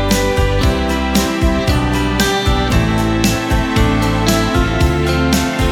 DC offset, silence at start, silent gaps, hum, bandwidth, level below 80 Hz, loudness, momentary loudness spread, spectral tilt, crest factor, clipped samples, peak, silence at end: under 0.1%; 0 s; none; none; 18.5 kHz; -20 dBFS; -15 LUFS; 1 LU; -5 dB/octave; 14 dB; under 0.1%; 0 dBFS; 0 s